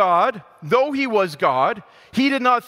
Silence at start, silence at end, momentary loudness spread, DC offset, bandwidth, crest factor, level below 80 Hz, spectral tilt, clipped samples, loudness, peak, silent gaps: 0 s; 0.05 s; 9 LU; under 0.1%; 15.5 kHz; 16 dB; -64 dBFS; -5.5 dB/octave; under 0.1%; -19 LUFS; -4 dBFS; none